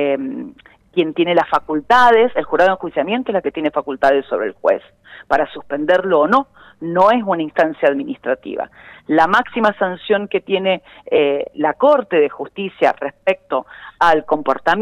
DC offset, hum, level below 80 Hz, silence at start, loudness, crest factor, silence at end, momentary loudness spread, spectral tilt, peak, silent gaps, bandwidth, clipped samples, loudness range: under 0.1%; none; -52 dBFS; 0 s; -17 LUFS; 14 dB; 0 s; 10 LU; -6 dB/octave; -2 dBFS; none; 11 kHz; under 0.1%; 2 LU